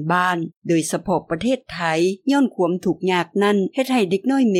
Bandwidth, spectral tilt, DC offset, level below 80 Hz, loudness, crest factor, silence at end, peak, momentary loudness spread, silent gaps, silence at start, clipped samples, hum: 16 kHz; -5.5 dB/octave; under 0.1%; -56 dBFS; -20 LUFS; 14 dB; 0 s; -6 dBFS; 4 LU; 0.56-0.62 s; 0 s; under 0.1%; none